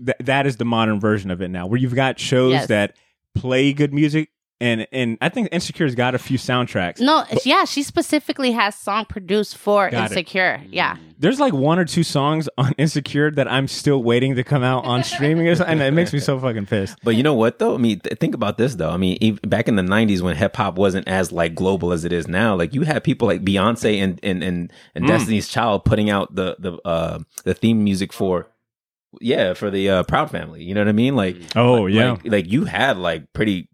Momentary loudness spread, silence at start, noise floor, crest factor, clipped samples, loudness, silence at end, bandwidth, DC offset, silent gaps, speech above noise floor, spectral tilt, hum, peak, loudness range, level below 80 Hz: 6 LU; 0 s; -86 dBFS; 18 dB; under 0.1%; -19 LUFS; 0.1 s; 15.5 kHz; under 0.1%; none; 67 dB; -6 dB/octave; none; -2 dBFS; 2 LU; -48 dBFS